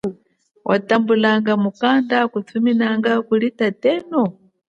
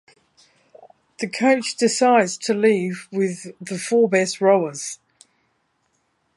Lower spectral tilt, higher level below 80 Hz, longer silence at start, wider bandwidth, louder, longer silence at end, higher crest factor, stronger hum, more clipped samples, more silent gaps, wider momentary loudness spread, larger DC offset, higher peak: first, -7 dB/octave vs -4 dB/octave; first, -66 dBFS vs -74 dBFS; second, 0.05 s vs 1.2 s; second, 7.2 kHz vs 11.5 kHz; about the same, -18 LUFS vs -20 LUFS; second, 0.45 s vs 1.4 s; about the same, 16 dB vs 18 dB; neither; neither; neither; second, 5 LU vs 14 LU; neither; about the same, -2 dBFS vs -4 dBFS